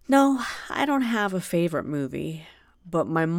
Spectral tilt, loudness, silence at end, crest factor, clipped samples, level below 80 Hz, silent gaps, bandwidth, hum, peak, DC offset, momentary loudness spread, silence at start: -6 dB/octave; -25 LUFS; 0 s; 20 dB; under 0.1%; -58 dBFS; none; 16.5 kHz; none; -4 dBFS; under 0.1%; 11 LU; 0.1 s